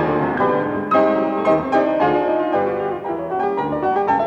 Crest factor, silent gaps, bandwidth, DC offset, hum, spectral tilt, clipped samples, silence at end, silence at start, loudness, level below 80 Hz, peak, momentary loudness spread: 14 dB; none; 7.2 kHz; under 0.1%; none; -8 dB/octave; under 0.1%; 0 s; 0 s; -19 LUFS; -52 dBFS; -4 dBFS; 6 LU